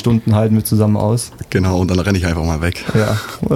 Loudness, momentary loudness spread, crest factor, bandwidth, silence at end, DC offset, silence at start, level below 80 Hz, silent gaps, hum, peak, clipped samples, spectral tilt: -16 LUFS; 5 LU; 12 dB; 15 kHz; 0 s; under 0.1%; 0 s; -32 dBFS; none; none; -2 dBFS; under 0.1%; -6.5 dB/octave